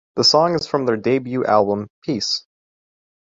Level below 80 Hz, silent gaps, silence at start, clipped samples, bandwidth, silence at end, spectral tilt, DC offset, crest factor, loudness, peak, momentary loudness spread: -58 dBFS; 1.90-2.02 s; 0.15 s; under 0.1%; 7.8 kHz; 0.85 s; -4 dB/octave; under 0.1%; 18 dB; -18 LUFS; -2 dBFS; 10 LU